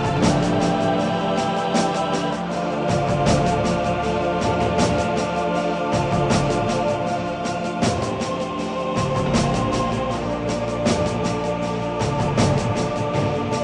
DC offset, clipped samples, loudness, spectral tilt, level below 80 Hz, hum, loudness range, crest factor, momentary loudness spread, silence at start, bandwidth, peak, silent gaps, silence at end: under 0.1%; under 0.1%; -21 LUFS; -5.5 dB/octave; -40 dBFS; none; 2 LU; 14 dB; 5 LU; 0 s; 11 kHz; -6 dBFS; none; 0 s